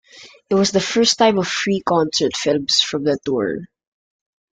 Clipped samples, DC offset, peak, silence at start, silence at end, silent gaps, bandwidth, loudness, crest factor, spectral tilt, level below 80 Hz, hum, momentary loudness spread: under 0.1%; under 0.1%; -2 dBFS; 0.15 s; 0.95 s; none; 9.4 kHz; -18 LUFS; 18 dB; -3.5 dB/octave; -56 dBFS; none; 6 LU